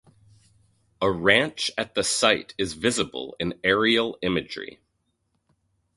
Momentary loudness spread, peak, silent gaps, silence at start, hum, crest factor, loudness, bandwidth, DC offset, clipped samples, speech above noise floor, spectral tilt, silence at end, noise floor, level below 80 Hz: 11 LU; -2 dBFS; none; 1 s; none; 24 dB; -23 LUFS; 11.5 kHz; under 0.1%; under 0.1%; 49 dB; -3 dB/octave; 1.25 s; -74 dBFS; -54 dBFS